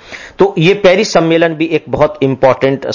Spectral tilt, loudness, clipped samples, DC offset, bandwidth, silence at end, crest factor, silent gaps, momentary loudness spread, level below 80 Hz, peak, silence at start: -5.5 dB/octave; -11 LUFS; 0.1%; under 0.1%; 7.4 kHz; 0 s; 12 dB; none; 6 LU; -42 dBFS; 0 dBFS; 0.05 s